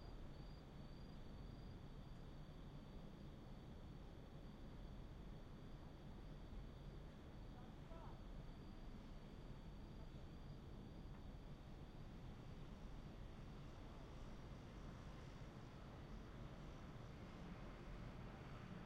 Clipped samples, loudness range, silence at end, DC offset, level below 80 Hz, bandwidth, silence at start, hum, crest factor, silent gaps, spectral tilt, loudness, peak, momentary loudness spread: under 0.1%; 2 LU; 0 s; under 0.1%; -58 dBFS; 12 kHz; 0 s; none; 14 dB; none; -7 dB/octave; -59 LUFS; -42 dBFS; 2 LU